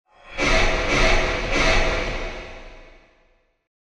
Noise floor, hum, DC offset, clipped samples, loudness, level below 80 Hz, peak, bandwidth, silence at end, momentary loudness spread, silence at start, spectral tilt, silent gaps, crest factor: -61 dBFS; none; under 0.1%; under 0.1%; -21 LUFS; -26 dBFS; -4 dBFS; 10 kHz; 1.05 s; 18 LU; 0.25 s; -3.5 dB/octave; none; 18 dB